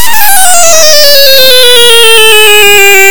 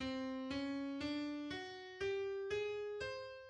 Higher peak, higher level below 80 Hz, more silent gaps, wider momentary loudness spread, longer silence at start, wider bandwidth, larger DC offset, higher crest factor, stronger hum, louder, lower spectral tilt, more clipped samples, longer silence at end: first, 0 dBFS vs -30 dBFS; first, -40 dBFS vs -68 dBFS; neither; second, 2 LU vs 5 LU; about the same, 0 s vs 0 s; first, over 20 kHz vs 9.8 kHz; first, 50% vs under 0.1%; second, 6 dB vs 12 dB; neither; first, 0 LUFS vs -43 LUFS; second, 1 dB/octave vs -5 dB/octave; first, 50% vs under 0.1%; about the same, 0 s vs 0 s